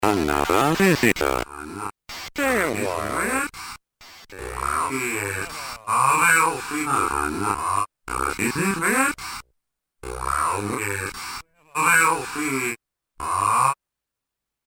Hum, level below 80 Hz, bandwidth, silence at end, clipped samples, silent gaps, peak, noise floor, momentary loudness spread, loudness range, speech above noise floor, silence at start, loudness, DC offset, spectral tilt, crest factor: none; -46 dBFS; over 20 kHz; 0.95 s; under 0.1%; none; -4 dBFS; -85 dBFS; 16 LU; 4 LU; 62 dB; 0 s; -22 LUFS; under 0.1%; -3.5 dB/octave; 20 dB